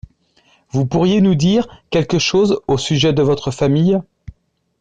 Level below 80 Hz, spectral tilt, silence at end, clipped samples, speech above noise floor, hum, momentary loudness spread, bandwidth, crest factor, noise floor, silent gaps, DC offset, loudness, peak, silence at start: -44 dBFS; -6 dB/octave; 0.8 s; under 0.1%; 41 dB; none; 7 LU; 9.4 kHz; 12 dB; -56 dBFS; none; under 0.1%; -16 LUFS; -4 dBFS; 0.75 s